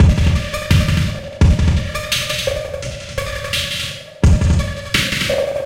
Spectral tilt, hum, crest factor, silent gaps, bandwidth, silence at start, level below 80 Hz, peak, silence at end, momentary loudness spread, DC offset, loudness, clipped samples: -5 dB/octave; none; 14 dB; none; 16.5 kHz; 0 s; -20 dBFS; -2 dBFS; 0 s; 10 LU; under 0.1%; -17 LUFS; under 0.1%